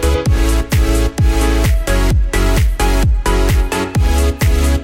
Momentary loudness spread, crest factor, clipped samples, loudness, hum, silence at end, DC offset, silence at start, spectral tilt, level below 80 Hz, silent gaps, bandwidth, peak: 1 LU; 12 dB; under 0.1%; -15 LUFS; none; 0 s; under 0.1%; 0 s; -5.5 dB/octave; -14 dBFS; none; 16.5 kHz; -2 dBFS